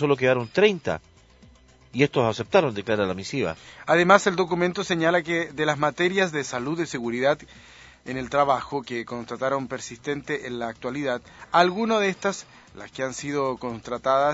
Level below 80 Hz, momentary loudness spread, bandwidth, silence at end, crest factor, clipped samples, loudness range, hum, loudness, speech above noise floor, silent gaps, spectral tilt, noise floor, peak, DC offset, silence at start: -58 dBFS; 12 LU; 8 kHz; 0 s; 24 dB; under 0.1%; 5 LU; none; -24 LUFS; 29 dB; none; -5 dB/octave; -53 dBFS; 0 dBFS; under 0.1%; 0 s